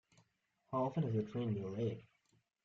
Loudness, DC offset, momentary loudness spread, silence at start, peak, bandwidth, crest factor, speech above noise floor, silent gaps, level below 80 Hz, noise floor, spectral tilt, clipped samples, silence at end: -40 LUFS; under 0.1%; 6 LU; 0.7 s; -26 dBFS; 7.2 kHz; 14 dB; 41 dB; none; -76 dBFS; -80 dBFS; -9.5 dB/octave; under 0.1%; 0.65 s